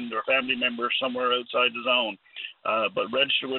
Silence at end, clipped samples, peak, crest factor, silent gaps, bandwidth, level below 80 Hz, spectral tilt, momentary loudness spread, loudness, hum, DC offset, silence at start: 0 s; under 0.1%; -8 dBFS; 18 dB; none; 4.4 kHz; -76 dBFS; -6.5 dB/octave; 8 LU; -25 LUFS; none; under 0.1%; 0 s